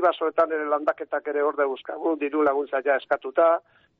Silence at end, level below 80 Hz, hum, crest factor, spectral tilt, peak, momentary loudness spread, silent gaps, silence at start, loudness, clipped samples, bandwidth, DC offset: 0.4 s; -72 dBFS; none; 16 dB; -1 dB/octave; -8 dBFS; 7 LU; none; 0 s; -24 LUFS; under 0.1%; 4.8 kHz; under 0.1%